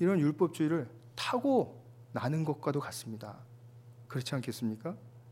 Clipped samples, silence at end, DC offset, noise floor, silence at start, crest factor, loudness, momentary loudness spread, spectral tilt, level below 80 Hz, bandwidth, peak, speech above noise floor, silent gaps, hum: under 0.1%; 0 s; under 0.1%; -54 dBFS; 0 s; 18 dB; -34 LUFS; 17 LU; -6.5 dB/octave; -78 dBFS; 16 kHz; -16 dBFS; 21 dB; none; none